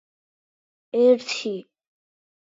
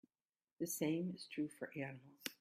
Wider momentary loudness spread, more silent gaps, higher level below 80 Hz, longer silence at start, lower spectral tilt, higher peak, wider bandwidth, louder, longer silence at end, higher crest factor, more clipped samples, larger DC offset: first, 13 LU vs 10 LU; neither; about the same, -86 dBFS vs -86 dBFS; first, 0.95 s vs 0.6 s; about the same, -4 dB/octave vs -4.5 dB/octave; first, -6 dBFS vs -22 dBFS; second, 7.8 kHz vs 16 kHz; first, -22 LUFS vs -44 LUFS; first, 0.9 s vs 0.05 s; about the same, 18 dB vs 22 dB; neither; neither